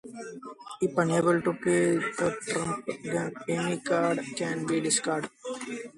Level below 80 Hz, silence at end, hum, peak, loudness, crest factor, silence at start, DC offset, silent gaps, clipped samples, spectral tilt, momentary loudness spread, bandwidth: -68 dBFS; 0.05 s; none; -10 dBFS; -28 LUFS; 18 dB; 0.05 s; under 0.1%; none; under 0.1%; -4.5 dB/octave; 13 LU; 11.5 kHz